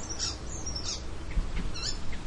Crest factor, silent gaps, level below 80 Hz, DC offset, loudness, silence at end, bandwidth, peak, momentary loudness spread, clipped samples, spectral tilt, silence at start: 16 dB; none; -36 dBFS; under 0.1%; -35 LUFS; 0 s; 11 kHz; -16 dBFS; 4 LU; under 0.1%; -2.5 dB/octave; 0 s